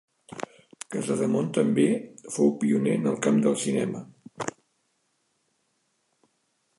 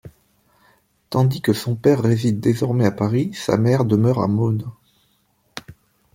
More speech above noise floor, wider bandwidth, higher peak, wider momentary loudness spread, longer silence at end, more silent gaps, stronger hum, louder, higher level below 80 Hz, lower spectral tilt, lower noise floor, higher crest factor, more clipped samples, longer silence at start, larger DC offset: first, 49 dB vs 45 dB; second, 11.5 kHz vs 16.5 kHz; second, -8 dBFS vs -2 dBFS; about the same, 16 LU vs 17 LU; first, 2.3 s vs 0.45 s; neither; neither; second, -26 LUFS vs -19 LUFS; second, -74 dBFS vs -54 dBFS; second, -6 dB/octave vs -7.5 dB/octave; first, -73 dBFS vs -63 dBFS; about the same, 18 dB vs 18 dB; neither; first, 0.3 s vs 0.05 s; neither